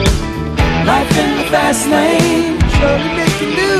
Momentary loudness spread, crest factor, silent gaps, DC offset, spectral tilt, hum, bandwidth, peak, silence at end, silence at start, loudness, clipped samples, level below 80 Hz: 3 LU; 12 dB; none; under 0.1%; -5 dB/octave; none; 14 kHz; 0 dBFS; 0 s; 0 s; -13 LUFS; under 0.1%; -22 dBFS